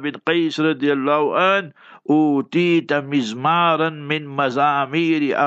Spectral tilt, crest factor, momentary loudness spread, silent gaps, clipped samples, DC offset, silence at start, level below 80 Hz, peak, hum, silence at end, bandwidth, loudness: -6 dB/octave; 16 dB; 5 LU; none; under 0.1%; under 0.1%; 0 s; -76 dBFS; -4 dBFS; none; 0 s; 8 kHz; -19 LUFS